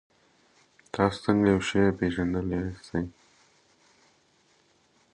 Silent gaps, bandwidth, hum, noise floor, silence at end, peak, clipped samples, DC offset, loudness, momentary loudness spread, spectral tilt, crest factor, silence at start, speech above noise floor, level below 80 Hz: none; 10 kHz; none; -65 dBFS; 2.05 s; -6 dBFS; under 0.1%; under 0.1%; -27 LUFS; 10 LU; -6.5 dB/octave; 24 dB; 0.95 s; 39 dB; -50 dBFS